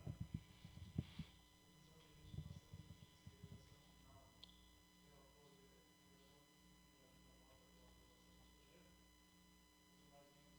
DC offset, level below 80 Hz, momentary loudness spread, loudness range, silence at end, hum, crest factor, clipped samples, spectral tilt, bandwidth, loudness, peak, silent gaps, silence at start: under 0.1%; -70 dBFS; 16 LU; 11 LU; 0 s; none; 30 dB; under 0.1%; -5.5 dB/octave; over 20 kHz; -61 LUFS; -30 dBFS; none; 0 s